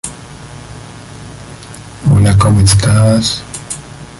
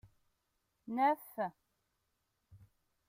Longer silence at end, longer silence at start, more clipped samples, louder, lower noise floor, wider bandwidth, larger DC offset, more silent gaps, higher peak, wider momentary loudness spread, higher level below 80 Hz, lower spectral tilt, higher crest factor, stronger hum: second, 0.05 s vs 0.5 s; second, 0.05 s vs 0.85 s; neither; first, -11 LUFS vs -36 LUFS; second, -31 dBFS vs -83 dBFS; second, 11.5 kHz vs 16 kHz; neither; neither; first, 0 dBFS vs -22 dBFS; first, 22 LU vs 12 LU; first, -28 dBFS vs -78 dBFS; about the same, -5 dB/octave vs -6 dB/octave; second, 14 dB vs 20 dB; neither